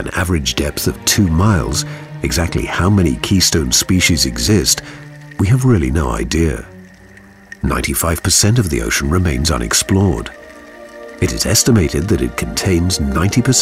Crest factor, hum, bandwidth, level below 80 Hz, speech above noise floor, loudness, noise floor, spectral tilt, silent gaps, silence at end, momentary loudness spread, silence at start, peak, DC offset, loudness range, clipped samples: 14 dB; none; 16 kHz; -28 dBFS; 27 dB; -15 LUFS; -41 dBFS; -4 dB/octave; none; 0 s; 9 LU; 0 s; -2 dBFS; 0.2%; 3 LU; under 0.1%